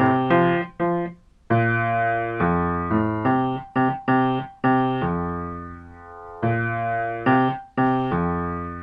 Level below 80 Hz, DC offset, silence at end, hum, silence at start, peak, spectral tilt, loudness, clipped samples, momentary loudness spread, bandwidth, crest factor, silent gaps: -46 dBFS; under 0.1%; 0 s; none; 0 s; -8 dBFS; -10 dB/octave; -22 LUFS; under 0.1%; 10 LU; 5 kHz; 16 dB; none